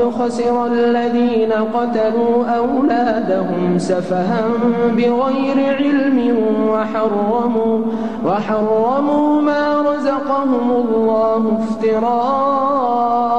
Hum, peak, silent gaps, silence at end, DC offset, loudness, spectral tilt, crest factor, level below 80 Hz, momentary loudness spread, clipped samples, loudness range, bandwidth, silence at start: none; -6 dBFS; none; 0 s; 1%; -16 LUFS; -7 dB/octave; 10 dB; -52 dBFS; 3 LU; under 0.1%; 1 LU; 9.4 kHz; 0 s